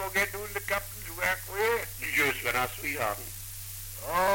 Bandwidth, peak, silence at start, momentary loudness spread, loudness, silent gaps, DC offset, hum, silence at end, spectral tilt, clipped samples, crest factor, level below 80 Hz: 17 kHz; -16 dBFS; 0 s; 12 LU; -30 LUFS; none; under 0.1%; none; 0 s; -2.5 dB/octave; under 0.1%; 16 dB; -50 dBFS